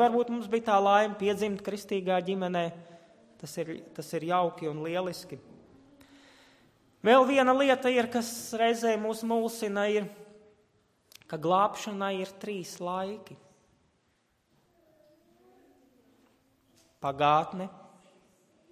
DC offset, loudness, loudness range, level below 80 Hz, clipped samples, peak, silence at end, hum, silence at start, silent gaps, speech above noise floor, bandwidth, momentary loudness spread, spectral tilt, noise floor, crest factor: under 0.1%; -28 LUFS; 11 LU; -72 dBFS; under 0.1%; -10 dBFS; 0.95 s; none; 0 s; none; 44 dB; 15.5 kHz; 16 LU; -5 dB/octave; -72 dBFS; 20 dB